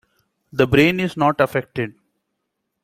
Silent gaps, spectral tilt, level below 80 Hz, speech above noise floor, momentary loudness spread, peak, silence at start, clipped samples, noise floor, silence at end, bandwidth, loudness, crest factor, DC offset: none; -6.5 dB/octave; -50 dBFS; 58 dB; 14 LU; -2 dBFS; 0.55 s; under 0.1%; -76 dBFS; 0.95 s; 16 kHz; -19 LUFS; 20 dB; under 0.1%